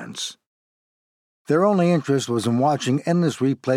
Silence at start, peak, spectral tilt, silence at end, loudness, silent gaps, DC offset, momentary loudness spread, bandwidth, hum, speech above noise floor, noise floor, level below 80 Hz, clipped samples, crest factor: 0 s; -6 dBFS; -6 dB/octave; 0 s; -21 LUFS; 0.46-1.45 s; under 0.1%; 9 LU; 13.5 kHz; none; over 70 dB; under -90 dBFS; -74 dBFS; under 0.1%; 16 dB